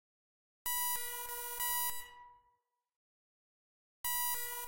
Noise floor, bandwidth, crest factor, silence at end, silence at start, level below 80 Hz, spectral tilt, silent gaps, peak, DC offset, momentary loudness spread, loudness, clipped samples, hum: -79 dBFS; 16 kHz; 22 dB; 0 s; 0.65 s; -68 dBFS; 2.5 dB/octave; 2.96-4.04 s; -20 dBFS; under 0.1%; 9 LU; -36 LUFS; under 0.1%; none